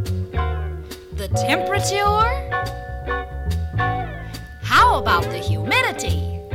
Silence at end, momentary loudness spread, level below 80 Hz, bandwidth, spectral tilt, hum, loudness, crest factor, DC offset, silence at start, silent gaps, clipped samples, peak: 0 s; 15 LU; -30 dBFS; 16.5 kHz; -4.5 dB/octave; none; -20 LUFS; 18 dB; under 0.1%; 0 s; none; under 0.1%; -2 dBFS